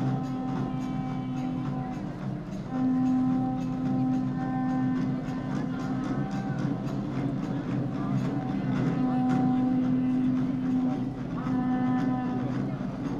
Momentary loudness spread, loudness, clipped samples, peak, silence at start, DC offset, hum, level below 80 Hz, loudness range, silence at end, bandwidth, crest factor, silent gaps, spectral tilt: 7 LU; -29 LUFS; under 0.1%; -14 dBFS; 0 s; under 0.1%; none; -50 dBFS; 3 LU; 0 s; 7.2 kHz; 14 dB; none; -8.5 dB/octave